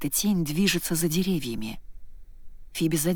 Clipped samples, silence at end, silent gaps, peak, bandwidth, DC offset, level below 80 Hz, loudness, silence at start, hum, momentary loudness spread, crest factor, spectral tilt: under 0.1%; 0 s; none; -10 dBFS; over 20 kHz; under 0.1%; -44 dBFS; -26 LUFS; 0 s; none; 14 LU; 16 dB; -4.5 dB/octave